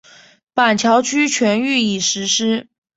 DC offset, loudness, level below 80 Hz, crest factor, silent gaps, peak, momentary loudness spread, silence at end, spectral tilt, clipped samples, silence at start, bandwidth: under 0.1%; -16 LUFS; -60 dBFS; 16 dB; none; 0 dBFS; 5 LU; 0.35 s; -2.5 dB/octave; under 0.1%; 0.55 s; 8 kHz